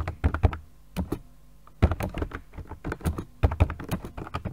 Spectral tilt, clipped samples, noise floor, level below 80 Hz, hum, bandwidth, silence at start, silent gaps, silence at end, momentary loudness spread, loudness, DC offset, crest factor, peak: -7.5 dB/octave; under 0.1%; -54 dBFS; -32 dBFS; none; 16 kHz; 0 s; none; 0 s; 13 LU; -30 LUFS; 0.3%; 24 dB; -4 dBFS